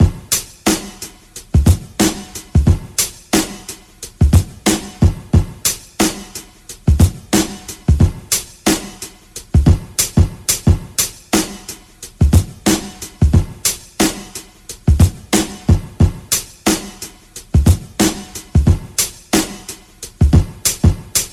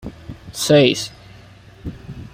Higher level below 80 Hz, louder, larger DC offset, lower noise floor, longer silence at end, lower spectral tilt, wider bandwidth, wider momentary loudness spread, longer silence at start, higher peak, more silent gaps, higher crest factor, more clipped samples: first, -22 dBFS vs -44 dBFS; about the same, -16 LUFS vs -16 LUFS; neither; second, -36 dBFS vs -43 dBFS; about the same, 0.05 s vs 0.05 s; about the same, -4.5 dB/octave vs -4.5 dB/octave; first, 19.5 kHz vs 16 kHz; second, 17 LU vs 22 LU; about the same, 0 s vs 0.05 s; about the same, 0 dBFS vs 0 dBFS; neither; about the same, 16 dB vs 20 dB; neither